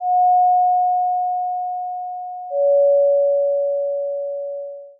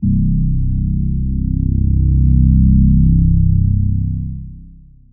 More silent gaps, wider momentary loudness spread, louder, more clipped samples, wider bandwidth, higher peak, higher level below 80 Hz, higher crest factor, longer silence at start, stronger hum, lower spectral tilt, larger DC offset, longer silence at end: neither; first, 13 LU vs 9 LU; second, -18 LUFS vs -15 LUFS; neither; first, 0.8 kHz vs 0.4 kHz; second, -10 dBFS vs -2 dBFS; second, under -90 dBFS vs -16 dBFS; about the same, 8 dB vs 12 dB; about the same, 0 s vs 0 s; neither; second, -8 dB/octave vs -22 dB/octave; neither; second, 0.1 s vs 0.4 s